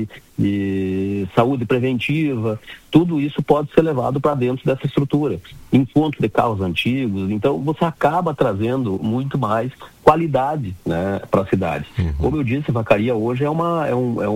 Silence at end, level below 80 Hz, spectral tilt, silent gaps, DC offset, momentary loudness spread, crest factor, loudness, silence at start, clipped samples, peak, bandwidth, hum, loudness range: 0 s; -40 dBFS; -8 dB/octave; none; under 0.1%; 6 LU; 18 dB; -19 LUFS; 0 s; under 0.1%; 0 dBFS; 16 kHz; none; 1 LU